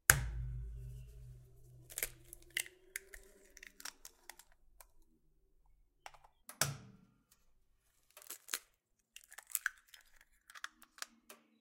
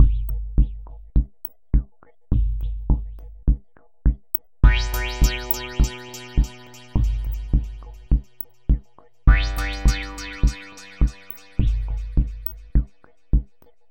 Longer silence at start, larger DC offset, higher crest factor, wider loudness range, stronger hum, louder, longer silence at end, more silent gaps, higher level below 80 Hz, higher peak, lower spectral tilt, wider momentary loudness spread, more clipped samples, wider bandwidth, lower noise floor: about the same, 0.1 s vs 0 s; neither; first, 44 dB vs 20 dB; first, 9 LU vs 3 LU; neither; second, -42 LUFS vs -25 LUFS; second, 0.25 s vs 0.45 s; neither; second, -54 dBFS vs -22 dBFS; about the same, 0 dBFS vs 0 dBFS; second, -1.5 dB/octave vs -5.5 dB/octave; first, 23 LU vs 15 LU; neither; about the same, 17 kHz vs 16.5 kHz; first, -79 dBFS vs -46 dBFS